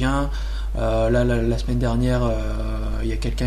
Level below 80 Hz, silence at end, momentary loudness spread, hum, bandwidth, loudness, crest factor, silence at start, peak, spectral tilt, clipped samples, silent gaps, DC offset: -24 dBFS; 0 s; 8 LU; none; 11 kHz; -23 LUFS; 14 dB; 0 s; -6 dBFS; -7 dB/octave; under 0.1%; none; under 0.1%